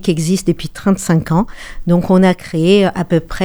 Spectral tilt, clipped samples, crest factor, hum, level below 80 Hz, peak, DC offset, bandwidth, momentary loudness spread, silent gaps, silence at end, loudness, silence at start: -6.5 dB/octave; under 0.1%; 14 dB; none; -34 dBFS; 0 dBFS; under 0.1%; over 20 kHz; 7 LU; none; 0 s; -14 LUFS; 0 s